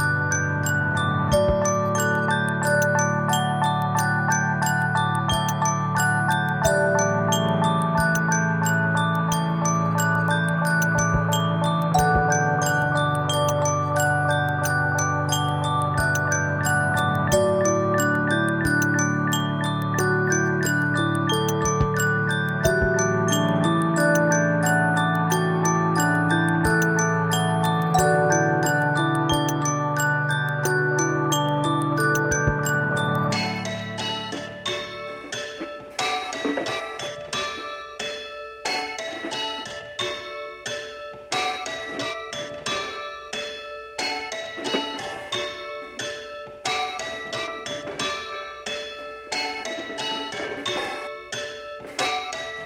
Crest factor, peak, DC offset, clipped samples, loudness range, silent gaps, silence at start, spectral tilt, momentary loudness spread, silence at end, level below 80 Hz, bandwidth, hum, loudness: 16 dB; -6 dBFS; under 0.1%; under 0.1%; 9 LU; none; 0 s; -4.5 dB/octave; 11 LU; 0 s; -46 dBFS; 17 kHz; none; -23 LUFS